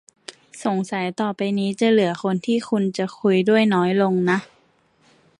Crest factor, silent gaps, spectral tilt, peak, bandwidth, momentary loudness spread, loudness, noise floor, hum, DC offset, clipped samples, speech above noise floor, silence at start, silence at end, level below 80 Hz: 16 dB; none; -6.5 dB/octave; -6 dBFS; 11.5 kHz; 8 LU; -21 LUFS; -60 dBFS; none; under 0.1%; under 0.1%; 40 dB; 0.3 s; 0.95 s; -68 dBFS